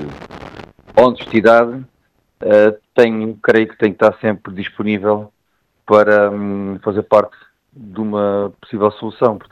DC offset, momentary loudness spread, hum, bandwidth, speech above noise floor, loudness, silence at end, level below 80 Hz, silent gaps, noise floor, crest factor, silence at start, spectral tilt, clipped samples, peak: under 0.1%; 16 LU; none; 7.8 kHz; 51 dB; -15 LUFS; 0.1 s; -54 dBFS; none; -65 dBFS; 16 dB; 0 s; -7.5 dB/octave; under 0.1%; 0 dBFS